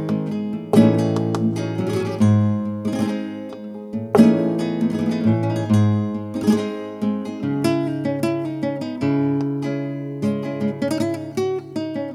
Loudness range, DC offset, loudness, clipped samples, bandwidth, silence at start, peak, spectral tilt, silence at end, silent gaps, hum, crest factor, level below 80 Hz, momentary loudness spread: 4 LU; under 0.1%; -21 LUFS; under 0.1%; 14 kHz; 0 s; -2 dBFS; -8 dB/octave; 0 s; none; none; 20 dB; -60 dBFS; 11 LU